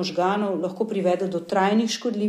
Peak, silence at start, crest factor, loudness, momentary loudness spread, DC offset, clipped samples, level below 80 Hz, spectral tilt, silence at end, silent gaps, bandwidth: -8 dBFS; 0 s; 14 dB; -23 LUFS; 5 LU; under 0.1%; under 0.1%; -74 dBFS; -5.5 dB/octave; 0 s; none; 13.5 kHz